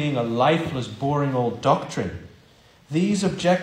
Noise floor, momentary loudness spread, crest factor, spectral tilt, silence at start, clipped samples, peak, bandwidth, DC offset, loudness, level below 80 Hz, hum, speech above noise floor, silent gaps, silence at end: -53 dBFS; 9 LU; 18 dB; -6 dB/octave; 0 s; under 0.1%; -6 dBFS; 14 kHz; under 0.1%; -23 LUFS; -54 dBFS; none; 31 dB; none; 0 s